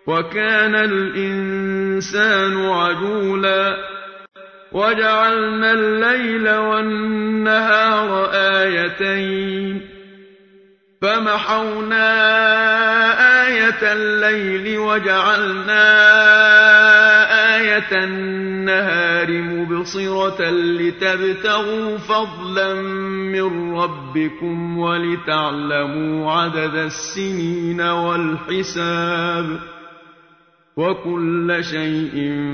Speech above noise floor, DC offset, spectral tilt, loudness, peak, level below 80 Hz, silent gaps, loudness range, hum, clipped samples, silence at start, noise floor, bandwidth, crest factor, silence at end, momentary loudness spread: 37 dB; under 0.1%; -4.5 dB/octave; -16 LUFS; 0 dBFS; -56 dBFS; none; 11 LU; none; under 0.1%; 0.05 s; -54 dBFS; 6.6 kHz; 16 dB; 0 s; 12 LU